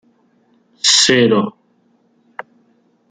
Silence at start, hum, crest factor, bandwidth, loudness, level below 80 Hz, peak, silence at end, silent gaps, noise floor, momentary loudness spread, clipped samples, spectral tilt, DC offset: 0.85 s; none; 18 dB; 11 kHz; -12 LUFS; -62 dBFS; 0 dBFS; 1.6 s; none; -58 dBFS; 25 LU; under 0.1%; -2.5 dB/octave; under 0.1%